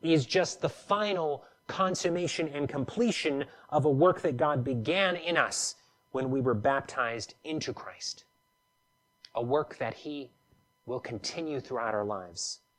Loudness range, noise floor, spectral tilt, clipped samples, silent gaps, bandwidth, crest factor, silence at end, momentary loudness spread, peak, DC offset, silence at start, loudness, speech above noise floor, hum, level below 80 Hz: 8 LU; -74 dBFS; -4.5 dB/octave; under 0.1%; none; 13 kHz; 20 dB; 0.2 s; 12 LU; -10 dBFS; under 0.1%; 0.05 s; -31 LUFS; 43 dB; none; -68 dBFS